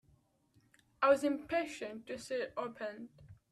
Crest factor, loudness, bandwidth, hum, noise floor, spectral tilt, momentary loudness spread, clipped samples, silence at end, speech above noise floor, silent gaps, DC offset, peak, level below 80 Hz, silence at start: 22 dB; -36 LUFS; 13 kHz; none; -72 dBFS; -4.5 dB/octave; 15 LU; under 0.1%; 0.2 s; 36 dB; none; under 0.1%; -16 dBFS; -72 dBFS; 1 s